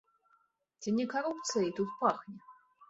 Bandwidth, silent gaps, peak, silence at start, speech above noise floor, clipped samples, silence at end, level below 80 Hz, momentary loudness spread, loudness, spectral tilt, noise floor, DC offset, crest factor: 8 kHz; none; -14 dBFS; 0.8 s; 40 dB; under 0.1%; 0.05 s; -76 dBFS; 13 LU; -34 LUFS; -4.5 dB/octave; -73 dBFS; under 0.1%; 22 dB